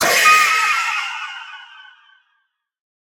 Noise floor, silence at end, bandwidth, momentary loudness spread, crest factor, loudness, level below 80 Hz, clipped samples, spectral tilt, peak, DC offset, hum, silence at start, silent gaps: -69 dBFS; 1.35 s; over 20 kHz; 23 LU; 18 dB; -14 LUFS; -64 dBFS; under 0.1%; 1 dB/octave; -2 dBFS; under 0.1%; none; 0 s; none